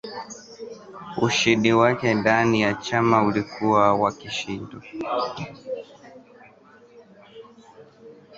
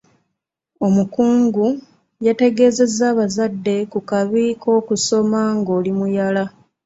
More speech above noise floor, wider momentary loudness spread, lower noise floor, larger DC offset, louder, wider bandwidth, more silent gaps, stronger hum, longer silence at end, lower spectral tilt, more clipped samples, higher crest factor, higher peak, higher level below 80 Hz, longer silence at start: second, 30 dB vs 60 dB; first, 19 LU vs 7 LU; second, -51 dBFS vs -77 dBFS; neither; second, -21 LUFS vs -17 LUFS; about the same, 8 kHz vs 8 kHz; neither; neither; second, 0 s vs 0.35 s; about the same, -5 dB/octave vs -5.5 dB/octave; neither; first, 22 dB vs 16 dB; about the same, -2 dBFS vs -2 dBFS; about the same, -58 dBFS vs -60 dBFS; second, 0.05 s vs 0.8 s